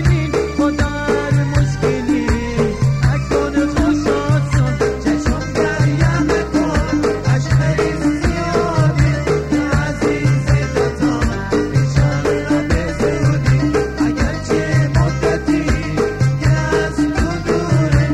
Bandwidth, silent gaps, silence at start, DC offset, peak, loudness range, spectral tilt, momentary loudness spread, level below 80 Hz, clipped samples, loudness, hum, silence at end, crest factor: 11 kHz; none; 0 s; 0.7%; 0 dBFS; 0 LU; -7 dB/octave; 3 LU; -26 dBFS; under 0.1%; -16 LUFS; none; 0 s; 14 dB